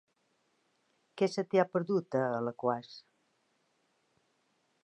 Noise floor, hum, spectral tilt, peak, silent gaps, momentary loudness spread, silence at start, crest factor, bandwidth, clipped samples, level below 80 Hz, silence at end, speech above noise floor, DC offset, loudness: -76 dBFS; none; -6.5 dB/octave; -14 dBFS; none; 10 LU; 1.15 s; 22 dB; 10 kHz; under 0.1%; -86 dBFS; 1.85 s; 44 dB; under 0.1%; -32 LUFS